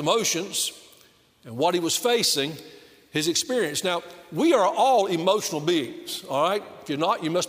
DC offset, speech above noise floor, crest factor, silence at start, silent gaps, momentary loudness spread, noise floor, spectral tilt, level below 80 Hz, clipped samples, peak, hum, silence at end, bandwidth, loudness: under 0.1%; 33 dB; 18 dB; 0 s; none; 11 LU; -57 dBFS; -3 dB/octave; -72 dBFS; under 0.1%; -8 dBFS; none; 0 s; 16 kHz; -24 LUFS